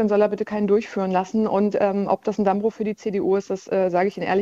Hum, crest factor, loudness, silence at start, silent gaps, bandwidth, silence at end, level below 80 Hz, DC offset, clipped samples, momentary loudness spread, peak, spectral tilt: none; 16 dB; -22 LUFS; 0 s; none; 7.6 kHz; 0 s; -60 dBFS; under 0.1%; under 0.1%; 4 LU; -6 dBFS; -7.5 dB/octave